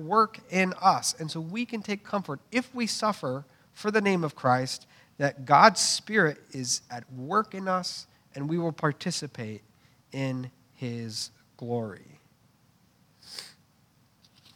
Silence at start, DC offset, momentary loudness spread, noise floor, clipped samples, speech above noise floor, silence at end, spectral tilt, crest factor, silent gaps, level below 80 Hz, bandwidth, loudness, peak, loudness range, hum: 0 s; under 0.1%; 17 LU; -64 dBFS; under 0.1%; 36 dB; 1.05 s; -4 dB/octave; 26 dB; none; -76 dBFS; 17 kHz; -27 LUFS; -2 dBFS; 14 LU; none